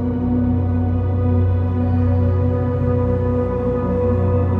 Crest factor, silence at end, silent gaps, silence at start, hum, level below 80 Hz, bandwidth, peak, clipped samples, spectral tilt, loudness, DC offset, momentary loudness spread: 12 dB; 0 s; none; 0 s; none; -32 dBFS; 3.4 kHz; -6 dBFS; under 0.1%; -12 dB/octave; -19 LUFS; under 0.1%; 2 LU